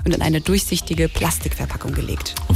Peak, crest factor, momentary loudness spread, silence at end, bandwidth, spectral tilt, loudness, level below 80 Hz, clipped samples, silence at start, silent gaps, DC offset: -6 dBFS; 14 dB; 7 LU; 0 s; 16 kHz; -4.5 dB/octave; -21 LUFS; -28 dBFS; under 0.1%; 0 s; none; under 0.1%